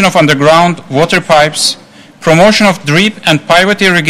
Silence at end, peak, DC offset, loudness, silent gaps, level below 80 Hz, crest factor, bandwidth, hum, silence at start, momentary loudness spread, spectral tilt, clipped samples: 0 s; 0 dBFS; under 0.1%; -8 LUFS; none; -40 dBFS; 8 dB; 16.5 kHz; none; 0 s; 6 LU; -4 dB/octave; 1%